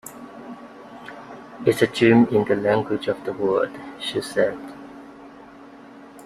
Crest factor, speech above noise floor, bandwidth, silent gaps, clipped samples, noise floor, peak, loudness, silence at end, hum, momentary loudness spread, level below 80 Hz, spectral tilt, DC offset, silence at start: 20 dB; 23 dB; 14.5 kHz; none; under 0.1%; -44 dBFS; -2 dBFS; -21 LUFS; 0 s; none; 25 LU; -60 dBFS; -6 dB/octave; under 0.1%; 0.05 s